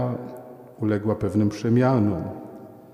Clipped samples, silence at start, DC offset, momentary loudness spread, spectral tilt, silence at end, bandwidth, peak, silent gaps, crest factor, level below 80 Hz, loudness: under 0.1%; 0 s; under 0.1%; 21 LU; -8.5 dB/octave; 0.1 s; 12.5 kHz; -8 dBFS; none; 16 dB; -54 dBFS; -23 LUFS